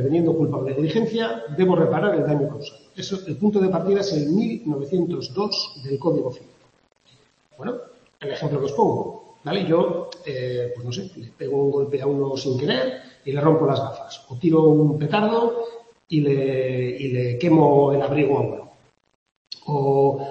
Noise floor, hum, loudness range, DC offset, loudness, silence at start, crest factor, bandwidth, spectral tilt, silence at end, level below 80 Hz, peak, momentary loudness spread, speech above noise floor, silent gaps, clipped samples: -58 dBFS; none; 6 LU; under 0.1%; -22 LUFS; 0 s; 18 dB; 7.8 kHz; -7.5 dB/octave; 0 s; -60 dBFS; -2 dBFS; 14 LU; 37 dB; 19.15-19.26 s, 19.36-19.45 s; under 0.1%